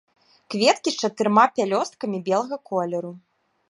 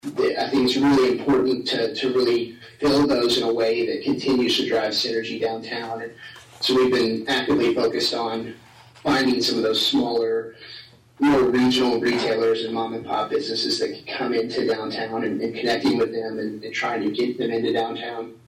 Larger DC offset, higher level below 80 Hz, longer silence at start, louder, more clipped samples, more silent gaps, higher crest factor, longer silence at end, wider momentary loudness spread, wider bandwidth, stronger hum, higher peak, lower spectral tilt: neither; second, -78 dBFS vs -56 dBFS; first, 0.5 s vs 0.05 s; about the same, -22 LUFS vs -22 LUFS; neither; neither; first, 20 dB vs 10 dB; first, 0.5 s vs 0.1 s; about the same, 11 LU vs 11 LU; second, 11.5 kHz vs 15.5 kHz; neither; first, -4 dBFS vs -12 dBFS; about the same, -4 dB/octave vs -4.5 dB/octave